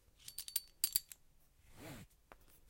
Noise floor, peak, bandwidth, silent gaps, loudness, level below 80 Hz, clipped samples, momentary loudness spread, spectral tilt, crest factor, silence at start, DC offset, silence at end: -68 dBFS; -14 dBFS; 17 kHz; none; -39 LUFS; -68 dBFS; under 0.1%; 22 LU; 0 dB/octave; 32 dB; 0.2 s; under 0.1%; 0 s